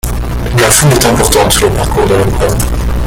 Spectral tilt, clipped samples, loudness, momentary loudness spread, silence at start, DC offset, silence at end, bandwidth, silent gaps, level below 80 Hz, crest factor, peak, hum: -4 dB/octave; 0.2%; -9 LUFS; 8 LU; 0.05 s; under 0.1%; 0 s; over 20 kHz; none; -18 dBFS; 10 dB; 0 dBFS; none